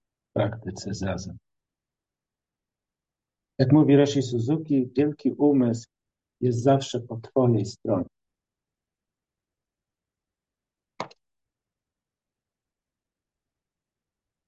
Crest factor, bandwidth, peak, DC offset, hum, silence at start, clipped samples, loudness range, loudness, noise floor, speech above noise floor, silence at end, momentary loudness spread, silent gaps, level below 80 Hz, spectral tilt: 20 dB; 8.2 kHz; -6 dBFS; under 0.1%; none; 0.35 s; under 0.1%; 12 LU; -24 LUFS; -90 dBFS; 67 dB; 3.4 s; 18 LU; none; -58 dBFS; -7.5 dB/octave